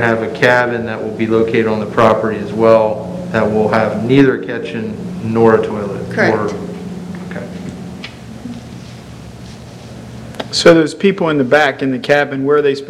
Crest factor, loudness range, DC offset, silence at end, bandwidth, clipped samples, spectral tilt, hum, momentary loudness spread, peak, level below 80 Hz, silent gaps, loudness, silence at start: 14 dB; 14 LU; under 0.1%; 0 s; 13 kHz; 0.3%; -6 dB/octave; none; 20 LU; 0 dBFS; -48 dBFS; none; -14 LUFS; 0 s